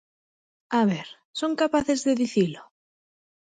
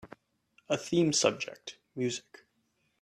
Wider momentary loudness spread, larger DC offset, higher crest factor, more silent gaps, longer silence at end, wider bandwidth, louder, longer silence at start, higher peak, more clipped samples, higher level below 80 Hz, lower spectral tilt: second, 10 LU vs 15 LU; neither; about the same, 18 dB vs 22 dB; first, 1.25-1.34 s vs none; about the same, 0.8 s vs 0.8 s; second, 9.4 kHz vs 13 kHz; first, -25 LUFS vs -31 LUFS; first, 0.7 s vs 0.05 s; about the same, -10 dBFS vs -12 dBFS; neither; first, -64 dBFS vs -70 dBFS; first, -5.5 dB/octave vs -3.5 dB/octave